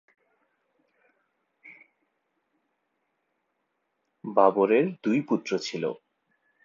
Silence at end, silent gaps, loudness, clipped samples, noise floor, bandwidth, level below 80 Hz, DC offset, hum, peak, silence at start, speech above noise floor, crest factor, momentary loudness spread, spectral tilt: 0.7 s; none; -25 LUFS; under 0.1%; -78 dBFS; 7.6 kHz; -84 dBFS; under 0.1%; none; -6 dBFS; 1.65 s; 54 dB; 24 dB; 13 LU; -6 dB/octave